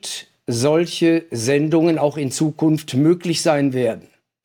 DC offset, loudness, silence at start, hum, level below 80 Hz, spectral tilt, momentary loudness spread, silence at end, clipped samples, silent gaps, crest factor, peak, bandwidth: under 0.1%; -18 LUFS; 0.05 s; none; -64 dBFS; -5.5 dB/octave; 7 LU; 0.45 s; under 0.1%; none; 14 dB; -4 dBFS; 17.5 kHz